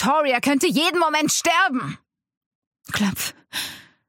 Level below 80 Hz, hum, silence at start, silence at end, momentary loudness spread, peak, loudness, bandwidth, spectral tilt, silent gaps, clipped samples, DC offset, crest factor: -60 dBFS; none; 0 s; 0.3 s; 11 LU; -6 dBFS; -20 LUFS; 17 kHz; -3 dB/octave; 2.37-2.71 s; under 0.1%; under 0.1%; 16 dB